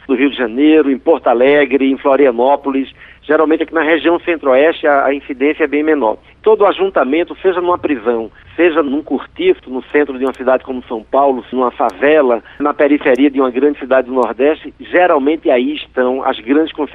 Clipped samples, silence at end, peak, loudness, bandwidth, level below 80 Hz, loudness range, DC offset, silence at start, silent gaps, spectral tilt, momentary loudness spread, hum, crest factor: under 0.1%; 0 s; -2 dBFS; -13 LUFS; 4.6 kHz; -50 dBFS; 3 LU; under 0.1%; 0.1 s; none; -6.5 dB/octave; 7 LU; none; 12 dB